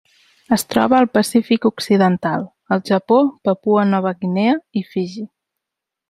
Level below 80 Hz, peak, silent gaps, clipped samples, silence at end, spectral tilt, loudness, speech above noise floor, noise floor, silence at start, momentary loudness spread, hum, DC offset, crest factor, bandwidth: -58 dBFS; 0 dBFS; none; under 0.1%; 0.85 s; -6 dB/octave; -17 LUFS; 67 dB; -83 dBFS; 0.5 s; 10 LU; none; under 0.1%; 18 dB; 15.5 kHz